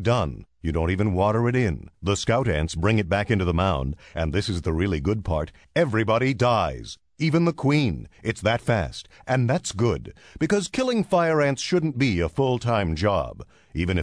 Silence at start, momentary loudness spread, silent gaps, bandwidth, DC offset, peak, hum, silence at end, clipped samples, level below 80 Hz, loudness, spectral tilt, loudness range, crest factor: 0 s; 9 LU; none; 10.5 kHz; under 0.1%; -8 dBFS; none; 0 s; under 0.1%; -40 dBFS; -24 LUFS; -6 dB/octave; 1 LU; 16 dB